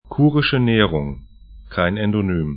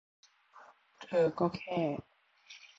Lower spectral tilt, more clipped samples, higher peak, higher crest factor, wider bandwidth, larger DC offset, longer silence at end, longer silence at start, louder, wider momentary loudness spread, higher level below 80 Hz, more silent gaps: first, -12 dB/octave vs -7.5 dB/octave; neither; first, 0 dBFS vs -18 dBFS; about the same, 18 dB vs 20 dB; second, 5 kHz vs 7.8 kHz; neither; second, 0 s vs 0.2 s; second, 0.05 s vs 0.55 s; first, -18 LUFS vs -33 LUFS; second, 13 LU vs 23 LU; first, -38 dBFS vs -72 dBFS; neither